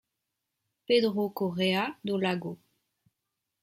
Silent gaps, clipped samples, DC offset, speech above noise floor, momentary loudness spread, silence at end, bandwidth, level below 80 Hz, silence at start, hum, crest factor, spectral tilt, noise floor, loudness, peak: none; under 0.1%; under 0.1%; 57 dB; 10 LU; 1.05 s; 16 kHz; -74 dBFS; 0.9 s; none; 18 dB; -6 dB/octave; -85 dBFS; -29 LUFS; -12 dBFS